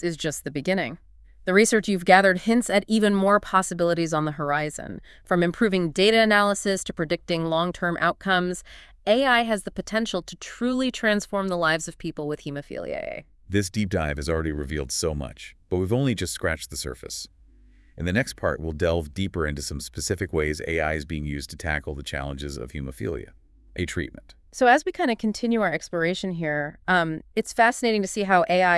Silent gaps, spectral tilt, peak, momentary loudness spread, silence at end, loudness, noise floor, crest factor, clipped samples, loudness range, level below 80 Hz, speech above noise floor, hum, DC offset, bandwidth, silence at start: none; -4.5 dB/octave; -2 dBFS; 14 LU; 0 s; -24 LUFS; -53 dBFS; 24 dB; under 0.1%; 8 LU; -44 dBFS; 29 dB; none; under 0.1%; 12 kHz; 0 s